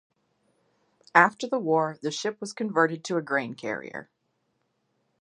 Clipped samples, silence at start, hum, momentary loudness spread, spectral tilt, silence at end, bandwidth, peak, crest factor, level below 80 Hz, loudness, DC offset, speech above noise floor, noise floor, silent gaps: under 0.1%; 1.15 s; none; 13 LU; -4.5 dB/octave; 1.2 s; 10.5 kHz; -2 dBFS; 26 dB; -78 dBFS; -26 LUFS; under 0.1%; 49 dB; -75 dBFS; none